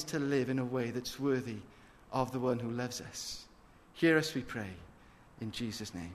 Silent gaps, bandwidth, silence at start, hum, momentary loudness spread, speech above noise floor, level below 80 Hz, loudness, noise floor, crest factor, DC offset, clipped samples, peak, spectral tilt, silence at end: none; 13.5 kHz; 0 s; none; 15 LU; 24 dB; -62 dBFS; -35 LUFS; -59 dBFS; 20 dB; under 0.1%; under 0.1%; -16 dBFS; -5 dB/octave; 0 s